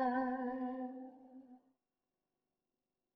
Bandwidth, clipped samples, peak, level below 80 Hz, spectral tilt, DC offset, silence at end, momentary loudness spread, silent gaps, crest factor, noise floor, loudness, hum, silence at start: 5 kHz; under 0.1%; -26 dBFS; -82 dBFS; -4 dB/octave; under 0.1%; 1.6 s; 21 LU; none; 18 dB; under -90 dBFS; -41 LUFS; 50 Hz at -105 dBFS; 0 s